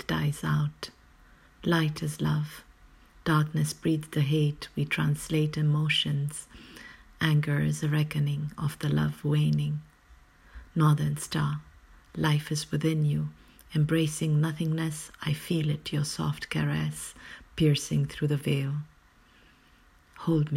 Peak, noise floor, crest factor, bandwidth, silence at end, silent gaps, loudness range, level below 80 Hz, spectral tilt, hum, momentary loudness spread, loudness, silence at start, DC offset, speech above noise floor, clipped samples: -10 dBFS; -59 dBFS; 18 dB; 14.5 kHz; 0 s; none; 2 LU; -54 dBFS; -6 dB/octave; none; 12 LU; -28 LUFS; 0 s; under 0.1%; 32 dB; under 0.1%